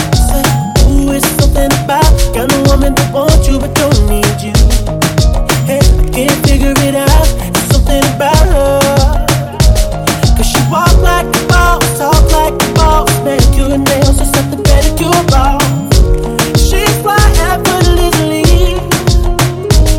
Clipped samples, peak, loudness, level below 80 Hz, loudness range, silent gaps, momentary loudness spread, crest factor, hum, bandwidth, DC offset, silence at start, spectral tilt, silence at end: 0.2%; 0 dBFS; -10 LUFS; -12 dBFS; 1 LU; none; 3 LU; 8 dB; none; 17 kHz; under 0.1%; 0 s; -5 dB/octave; 0 s